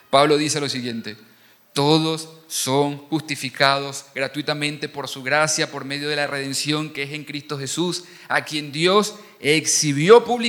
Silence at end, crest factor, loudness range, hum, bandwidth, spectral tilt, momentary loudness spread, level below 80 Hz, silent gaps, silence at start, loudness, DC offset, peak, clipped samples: 0 s; 22 dB; 2 LU; none; 19 kHz; -3.5 dB/octave; 12 LU; -68 dBFS; none; 0.1 s; -21 LUFS; under 0.1%; 0 dBFS; under 0.1%